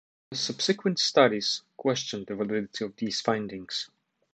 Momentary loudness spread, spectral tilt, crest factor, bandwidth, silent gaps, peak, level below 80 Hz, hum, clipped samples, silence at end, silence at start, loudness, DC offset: 12 LU; -3.5 dB/octave; 22 dB; 9.2 kHz; none; -6 dBFS; -70 dBFS; none; under 0.1%; 0.5 s; 0.3 s; -28 LUFS; under 0.1%